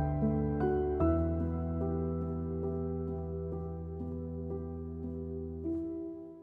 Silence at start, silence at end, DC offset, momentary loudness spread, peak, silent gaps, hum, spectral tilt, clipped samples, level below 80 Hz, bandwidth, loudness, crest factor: 0 s; 0 s; under 0.1%; 10 LU; -18 dBFS; none; none; -12.5 dB/octave; under 0.1%; -44 dBFS; 3.2 kHz; -35 LUFS; 16 dB